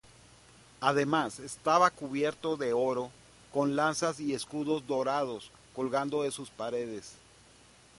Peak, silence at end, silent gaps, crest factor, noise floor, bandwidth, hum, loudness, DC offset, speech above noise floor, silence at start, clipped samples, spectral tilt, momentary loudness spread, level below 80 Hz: -10 dBFS; 0.85 s; none; 22 dB; -58 dBFS; 11.5 kHz; none; -31 LUFS; under 0.1%; 28 dB; 0.8 s; under 0.1%; -4.5 dB/octave; 11 LU; -68 dBFS